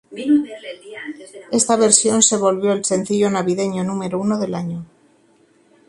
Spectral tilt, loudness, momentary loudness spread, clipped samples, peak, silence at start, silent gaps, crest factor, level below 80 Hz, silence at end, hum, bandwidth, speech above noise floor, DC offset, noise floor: -3.5 dB/octave; -17 LUFS; 20 LU; under 0.1%; 0 dBFS; 0.1 s; none; 20 dB; -62 dBFS; 1.05 s; none; 11.5 kHz; 38 dB; under 0.1%; -55 dBFS